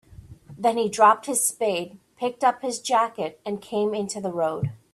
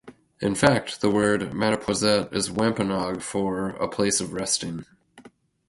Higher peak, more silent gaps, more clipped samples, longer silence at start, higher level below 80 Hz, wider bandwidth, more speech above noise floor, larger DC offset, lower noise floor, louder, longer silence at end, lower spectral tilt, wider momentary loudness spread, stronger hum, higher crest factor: about the same, -4 dBFS vs -4 dBFS; neither; neither; about the same, 0.1 s vs 0.05 s; second, -60 dBFS vs -52 dBFS; first, 15.5 kHz vs 11.5 kHz; second, 22 dB vs 28 dB; neither; second, -45 dBFS vs -52 dBFS; about the same, -24 LUFS vs -24 LUFS; second, 0.15 s vs 0.4 s; about the same, -3.5 dB/octave vs -4 dB/octave; first, 12 LU vs 7 LU; neither; about the same, 20 dB vs 20 dB